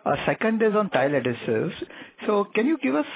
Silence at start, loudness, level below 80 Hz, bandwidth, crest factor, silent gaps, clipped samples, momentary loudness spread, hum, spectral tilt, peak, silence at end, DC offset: 0.05 s; -24 LUFS; -60 dBFS; 4 kHz; 18 dB; none; under 0.1%; 10 LU; none; -10 dB/octave; -6 dBFS; 0 s; under 0.1%